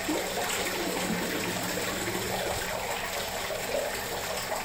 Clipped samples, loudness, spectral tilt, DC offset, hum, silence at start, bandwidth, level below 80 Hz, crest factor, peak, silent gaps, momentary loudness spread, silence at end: under 0.1%; -30 LUFS; -2.5 dB/octave; under 0.1%; none; 0 s; 16 kHz; -50 dBFS; 14 dB; -18 dBFS; none; 3 LU; 0 s